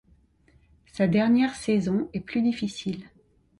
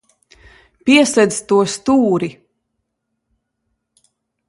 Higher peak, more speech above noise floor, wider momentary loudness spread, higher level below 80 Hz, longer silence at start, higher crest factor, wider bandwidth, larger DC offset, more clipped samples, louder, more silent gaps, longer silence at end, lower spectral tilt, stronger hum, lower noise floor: second, -10 dBFS vs 0 dBFS; second, 36 dB vs 60 dB; first, 13 LU vs 10 LU; about the same, -58 dBFS vs -56 dBFS; about the same, 0.95 s vs 0.85 s; about the same, 16 dB vs 18 dB; about the same, 11.5 kHz vs 11.5 kHz; neither; neither; second, -25 LUFS vs -15 LUFS; neither; second, 0.55 s vs 2.15 s; first, -6.5 dB/octave vs -4 dB/octave; neither; second, -61 dBFS vs -74 dBFS